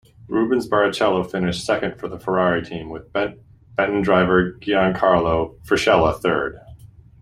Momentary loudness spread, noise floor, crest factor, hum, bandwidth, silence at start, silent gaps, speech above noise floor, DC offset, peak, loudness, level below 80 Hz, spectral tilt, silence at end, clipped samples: 11 LU; -44 dBFS; 18 dB; none; 15 kHz; 0.3 s; none; 25 dB; under 0.1%; -2 dBFS; -20 LUFS; -44 dBFS; -6 dB/octave; 0.35 s; under 0.1%